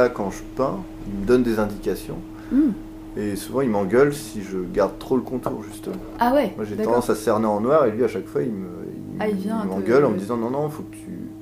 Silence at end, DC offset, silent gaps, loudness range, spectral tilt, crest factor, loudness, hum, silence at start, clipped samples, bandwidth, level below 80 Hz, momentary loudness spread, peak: 0 s; under 0.1%; none; 2 LU; -6.5 dB/octave; 18 dB; -23 LUFS; none; 0 s; under 0.1%; 15.5 kHz; -44 dBFS; 14 LU; -4 dBFS